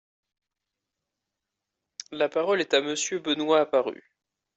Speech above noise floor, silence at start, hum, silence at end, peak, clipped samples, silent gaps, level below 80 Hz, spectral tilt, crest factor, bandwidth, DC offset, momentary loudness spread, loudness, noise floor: 61 dB; 2.1 s; none; 0.65 s; -8 dBFS; under 0.1%; none; -76 dBFS; -2.5 dB/octave; 20 dB; 8.2 kHz; under 0.1%; 16 LU; -25 LUFS; -86 dBFS